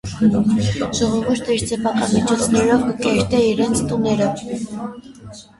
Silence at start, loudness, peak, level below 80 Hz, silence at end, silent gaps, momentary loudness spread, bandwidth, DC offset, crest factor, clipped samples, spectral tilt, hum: 0.05 s; -18 LUFS; -4 dBFS; -42 dBFS; 0.15 s; none; 12 LU; 11.5 kHz; under 0.1%; 14 dB; under 0.1%; -5.5 dB/octave; none